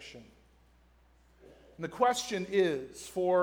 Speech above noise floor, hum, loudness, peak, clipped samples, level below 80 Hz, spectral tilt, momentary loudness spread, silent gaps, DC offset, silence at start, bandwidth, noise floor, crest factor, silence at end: 33 dB; none; -31 LUFS; -14 dBFS; under 0.1%; -64 dBFS; -4 dB/octave; 16 LU; none; under 0.1%; 0 s; 19.5 kHz; -63 dBFS; 20 dB; 0 s